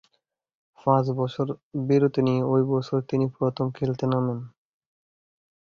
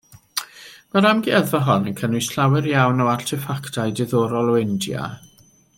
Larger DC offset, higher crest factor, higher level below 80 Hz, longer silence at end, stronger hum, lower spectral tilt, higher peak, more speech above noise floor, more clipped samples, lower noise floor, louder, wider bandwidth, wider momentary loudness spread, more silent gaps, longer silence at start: neither; about the same, 20 dB vs 18 dB; about the same, -62 dBFS vs -60 dBFS; first, 1.3 s vs 0.6 s; neither; first, -9 dB/octave vs -5.5 dB/octave; second, -6 dBFS vs -2 dBFS; first, 51 dB vs 24 dB; neither; first, -75 dBFS vs -43 dBFS; second, -25 LUFS vs -20 LUFS; second, 7 kHz vs 17 kHz; second, 8 LU vs 11 LU; first, 1.63-1.71 s vs none; first, 0.85 s vs 0.35 s